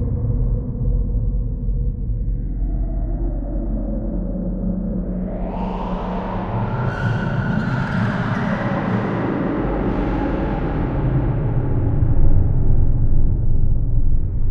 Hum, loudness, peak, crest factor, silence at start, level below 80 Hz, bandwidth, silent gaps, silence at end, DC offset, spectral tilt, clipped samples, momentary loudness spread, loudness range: none; -22 LUFS; -2 dBFS; 16 dB; 0 s; -20 dBFS; 4.7 kHz; none; 0 s; under 0.1%; -9.5 dB/octave; under 0.1%; 5 LU; 5 LU